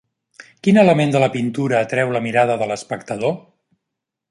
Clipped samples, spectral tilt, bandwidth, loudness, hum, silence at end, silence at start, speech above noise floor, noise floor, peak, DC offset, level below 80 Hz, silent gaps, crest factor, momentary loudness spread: under 0.1%; -6.5 dB/octave; 11.5 kHz; -18 LUFS; none; 0.9 s; 0.4 s; 64 dB; -81 dBFS; -2 dBFS; under 0.1%; -62 dBFS; none; 18 dB; 10 LU